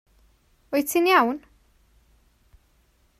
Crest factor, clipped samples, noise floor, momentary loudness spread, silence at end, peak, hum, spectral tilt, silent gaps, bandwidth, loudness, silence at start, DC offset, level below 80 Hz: 22 dB; under 0.1%; -63 dBFS; 10 LU; 1.8 s; -4 dBFS; none; -2.5 dB/octave; none; 16 kHz; -22 LUFS; 0.7 s; under 0.1%; -62 dBFS